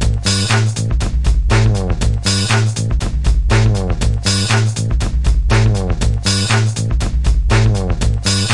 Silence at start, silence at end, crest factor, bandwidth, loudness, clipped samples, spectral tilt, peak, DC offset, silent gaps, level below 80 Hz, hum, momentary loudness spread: 0 s; 0 s; 14 dB; 11.5 kHz; -15 LUFS; under 0.1%; -4.5 dB/octave; 0 dBFS; under 0.1%; none; -18 dBFS; none; 4 LU